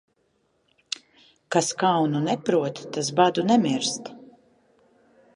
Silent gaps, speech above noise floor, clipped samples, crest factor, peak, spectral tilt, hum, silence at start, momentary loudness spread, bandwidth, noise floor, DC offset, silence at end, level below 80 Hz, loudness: none; 46 dB; under 0.1%; 22 dB; -4 dBFS; -4.5 dB/octave; none; 1.5 s; 14 LU; 11.5 kHz; -69 dBFS; under 0.1%; 1.15 s; -72 dBFS; -24 LUFS